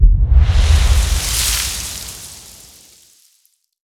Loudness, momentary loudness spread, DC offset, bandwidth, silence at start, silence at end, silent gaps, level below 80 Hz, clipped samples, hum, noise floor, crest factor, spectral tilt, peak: -15 LUFS; 19 LU; under 0.1%; 16 kHz; 0 s; 1.45 s; none; -16 dBFS; under 0.1%; none; -60 dBFS; 14 dB; -3 dB/octave; 0 dBFS